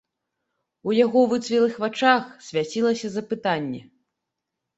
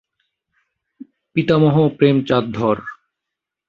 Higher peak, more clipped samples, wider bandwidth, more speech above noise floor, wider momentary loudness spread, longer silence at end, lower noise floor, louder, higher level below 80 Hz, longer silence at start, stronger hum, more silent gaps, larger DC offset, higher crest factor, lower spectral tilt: about the same, -4 dBFS vs -2 dBFS; neither; first, 8.2 kHz vs 7 kHz; second, 61 dB vs 67 dB; about the same, 10 LU vs 10 LU; first, 0.95 s vs 0.75 s; about the same, -83 dBFS vs -83 dBFS; second, -22 LUFS vs -17 LUFS; second, -68 dBFS vs -54 dBFS; second, 0.85 s vs 1.35 s; neither; neither; neither; about the same, 20 dB vs 18 dB; second, -5 dB/octave vs -8.5 dB/octave